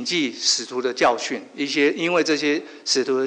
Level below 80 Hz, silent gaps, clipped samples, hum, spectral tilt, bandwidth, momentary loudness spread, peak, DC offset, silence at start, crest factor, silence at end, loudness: -66 dBFS; none; under 0.1%; none; -2 dB/octave; 10 kHz; 6 LU; -6 dBFS; under 0.1%; 0 s; 16 dB; 0 s; -21 LUFS